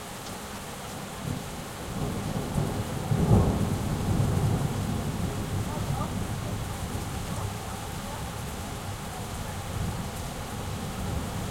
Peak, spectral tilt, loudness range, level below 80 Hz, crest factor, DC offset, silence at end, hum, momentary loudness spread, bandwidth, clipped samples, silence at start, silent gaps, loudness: -8 dBFS; -5.5 dB/octave; 7 LU; -40 dBFS; 22 dB; under 0.1%; 0 s; none; 9 LU; 16.5 kHz; under 0.1%; 0 s; none; -31 LUFS